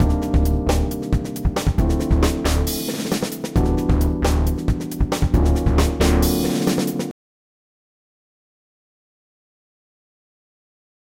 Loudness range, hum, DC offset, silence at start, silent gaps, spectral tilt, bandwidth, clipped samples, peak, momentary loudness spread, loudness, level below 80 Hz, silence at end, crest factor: 7 LU; none; under 0.1%; 0 s; none; -6 dB/octave; 17 kHz; under 0.1%; -4 dBFS; 6 LU; -20 LUFS; -24 dBFS; 4 s; 16 dB